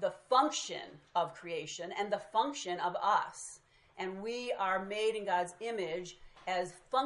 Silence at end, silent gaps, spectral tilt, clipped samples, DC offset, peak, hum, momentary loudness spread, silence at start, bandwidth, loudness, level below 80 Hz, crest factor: 0 s; none; -3 dB/octave; under 0.1%; under 0.1%; -14 dBFS; none; 12 LU; 0 s; 11.5 kHz; -35 LUFS; -74 dBFS; 20 dB